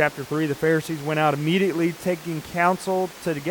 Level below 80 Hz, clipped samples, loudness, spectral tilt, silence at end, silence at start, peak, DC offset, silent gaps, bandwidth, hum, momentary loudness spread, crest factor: -60 dBFS; under 0.1%; -23 LUFS; -6 dB/octave; 0 s; 0 s; -6 dBFS; under 0.1%; none; 19 kHz; none; 6 LU; 18 dB